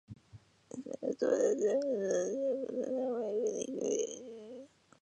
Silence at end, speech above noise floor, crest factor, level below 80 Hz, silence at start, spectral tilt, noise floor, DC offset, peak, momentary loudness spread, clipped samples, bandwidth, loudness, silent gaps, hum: 0.35 s; 26 dB; 18 dB; -76 dBFS; 0.1 s; -4.5 dB/octave; -59 dBFS; under 0.1%; -18 dBFS; 19 LU; under 0.1%; 9.8 kHz; -34 LUFS; none; none